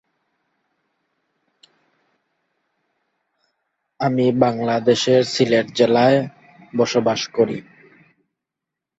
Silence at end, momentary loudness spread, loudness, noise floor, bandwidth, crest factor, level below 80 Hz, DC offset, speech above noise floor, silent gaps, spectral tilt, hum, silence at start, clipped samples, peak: 1.4 s; 7 LU; -18 LUFS; -84 dBFS; 8 kHz; 20 dB; -64 dBFS; under 0.1%; 67 dB; none; -5.5 dB/octave; none; 4 s; under 0.1%; -2 dBFS